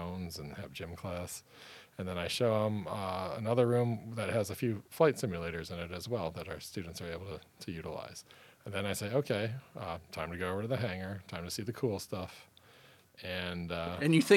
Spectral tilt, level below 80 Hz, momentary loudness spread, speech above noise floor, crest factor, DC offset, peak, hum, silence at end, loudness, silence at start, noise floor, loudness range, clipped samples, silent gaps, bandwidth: -5.5 dB/octave; -62 dBFS; 15 LU; 26 dB; 24 dB; under 0.1%; -12 dBFS; none; 0 s; -36 LUFS; 0 s; -61 dBFS; 7 LU; under 0.1%; none; 17.5 kHz